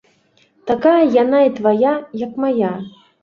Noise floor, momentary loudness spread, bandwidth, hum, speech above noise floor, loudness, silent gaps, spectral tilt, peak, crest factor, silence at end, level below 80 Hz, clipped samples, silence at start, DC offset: -57 dBFS; 15 LU; 6.8 kHz; none; 42 dB; -16 LUFS; none; -8 dB/octave; -2 dBFS; 14 dB; 0.35 s; -60 dBFS; under 0.1%; 0.65 s; under 0.1%